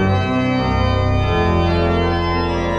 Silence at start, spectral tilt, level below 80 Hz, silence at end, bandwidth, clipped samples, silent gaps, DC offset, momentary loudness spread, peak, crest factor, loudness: 0 s; -7.5 dB/octave; -26 dBFS; 0 s; 7.4 kHz; under 0.1%; none; under 0.1%; 2 LU; -6 dBFS; 12 dB; -17 LUFS